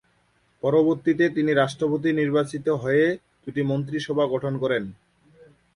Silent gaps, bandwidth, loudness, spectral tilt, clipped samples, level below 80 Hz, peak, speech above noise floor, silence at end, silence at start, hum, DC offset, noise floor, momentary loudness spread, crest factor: none; 11 kHz; -23 LUFS; -7 dB/octave; under 0.1%; -62 dBFS; -8 dBFS; 42 dB; 0.8 s; 0.65 s; none; under 0.1%; -65 dBFS; 7 LU; 16 dB